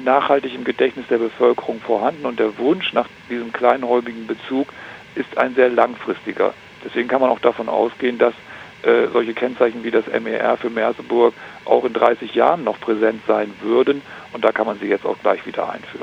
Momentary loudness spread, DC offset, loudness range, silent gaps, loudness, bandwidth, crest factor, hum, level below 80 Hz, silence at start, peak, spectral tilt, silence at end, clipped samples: 10 LU; under 0.1%; 2 LU; none; -19 LUFS; 7.8 kHz; 18 dB; none; -64 dBFS; 0 s; 0 dBFS; -6 dB/octave; 0 s; under 0.1%